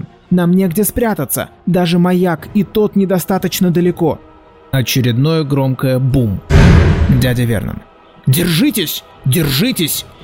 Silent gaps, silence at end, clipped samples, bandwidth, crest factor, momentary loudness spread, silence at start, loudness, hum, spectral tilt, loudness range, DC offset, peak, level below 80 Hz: none; 0.15 s; 0.1%; 16.5 kHz; 14 dB; 7 LU; 0.3 s; -14 LUFS; none; -6 dB/octave; 2 LU; 0.1%; 0 dBFS; -26 dBFS